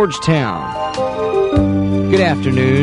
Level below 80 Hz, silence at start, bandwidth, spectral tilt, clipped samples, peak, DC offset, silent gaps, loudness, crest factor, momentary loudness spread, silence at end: -34 dBFS; 0 s; 11 kHz; -7 dB/octave; under 0.1%; 0 dBFS; under 0.1%; none; -16 LUFS; 14 dB; 6 LU; 0 s